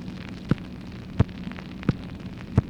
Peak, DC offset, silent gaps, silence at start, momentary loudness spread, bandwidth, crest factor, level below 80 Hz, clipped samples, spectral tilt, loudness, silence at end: -4 dBFS; under 0.1%; none; 0 s; 11 LU; 9 kHz; 24 dB; -40 dBFS; under 0.1%; -8.5 dB/octave; -30 LUFS; 0 s